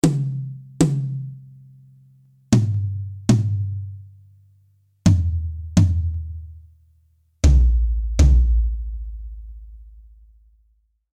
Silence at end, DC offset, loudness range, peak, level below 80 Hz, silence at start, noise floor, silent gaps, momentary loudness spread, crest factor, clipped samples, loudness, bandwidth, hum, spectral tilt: 1.15 s; under 0.1%; 4 LU; -2 dBFS; -24 dBFS; 0.05 s; -63 dBFS; none; 21 LU; 18 dB; under 0.1%; -21 LUFS; 11 kHz; none; -7 dB/octave